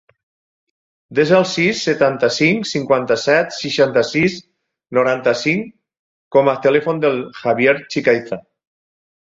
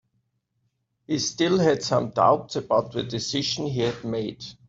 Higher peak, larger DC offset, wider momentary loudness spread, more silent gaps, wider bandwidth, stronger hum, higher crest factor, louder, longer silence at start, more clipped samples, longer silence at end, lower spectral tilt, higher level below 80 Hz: first, -2 dBFS vs -6 dBFS; neither; about the same, 7 LU vs 9 LU; first, 5.99-6.31 s vs none; about the same, 7.8 kHz vs 8 kHz; neither; about the same, 16 dB vs 20 dB; first, -16 LUFS vs -24 LUFS; about the same, 1.1 s vs 1.1 s; neither; first, 0.95 s vs 0.15 s; about the same, -5 dB/octave vs -4.5 dB/octave; about the same, -58 dBFS vs -60 dBFS